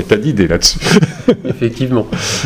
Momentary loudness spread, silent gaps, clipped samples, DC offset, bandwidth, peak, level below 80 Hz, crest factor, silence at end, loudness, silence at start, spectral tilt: 6 LU; none; 0.4%; under 0.1%; 18 kHz; 0 dBFS; -30 dBFS; 14 dB; 0 s; -13 LUFS; 0 s; -4.5 dB/octave